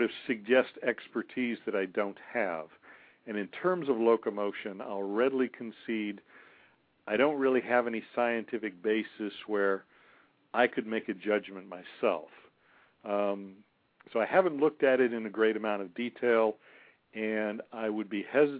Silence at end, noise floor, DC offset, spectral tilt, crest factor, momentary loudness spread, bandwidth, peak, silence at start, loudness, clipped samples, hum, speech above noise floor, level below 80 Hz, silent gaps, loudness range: 0 s; -65 dBFS; under 0.1%; -9 dB/octave; 20 dB; 12 LU; 4.8 kHz; -12 dBFS; 0 s; -31 LUFS; under 0.1%; none; 34 dB; -82 dBFS; none; 5 LU